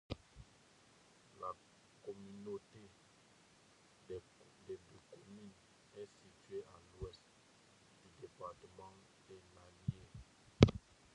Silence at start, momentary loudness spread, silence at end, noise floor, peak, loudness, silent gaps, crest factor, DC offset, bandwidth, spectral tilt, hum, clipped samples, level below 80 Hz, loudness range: 0.1 s; 17 LU; 0.35 s; -68 dBFS; -8 dBFS; -42 LUFS; none; 36 dB; under 0.1%; 11 kHz; -7 dB/octave; none; under 0.1%; -58 dBFS; 16 LU